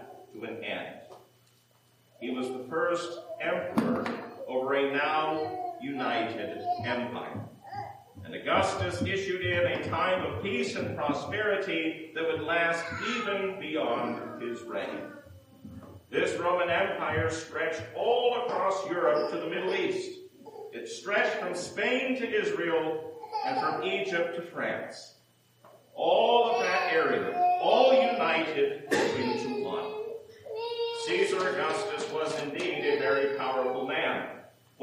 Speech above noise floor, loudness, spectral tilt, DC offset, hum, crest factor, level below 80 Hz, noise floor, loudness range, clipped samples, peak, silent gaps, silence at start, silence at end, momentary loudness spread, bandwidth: 35 dB; -29 LUFS; -4.5 dB/octave; under 0.1%; none; 22 dB; -72 dBFS; -64 dBFS; 7 LU; under 0.1%; -8 dBFS; none; 0 s; 0.35 s; 15 LU; 15.5 kHz